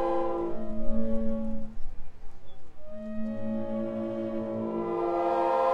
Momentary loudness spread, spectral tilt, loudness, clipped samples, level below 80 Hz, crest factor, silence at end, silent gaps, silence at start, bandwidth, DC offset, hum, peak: 16 LU; -8.5 dB/octave; -31 LUFS; under 0.1%; -40 dBFS; 14 dB; 0 s; none; 0 s; 5 kHz; under 0.1%; none; -12 dBFS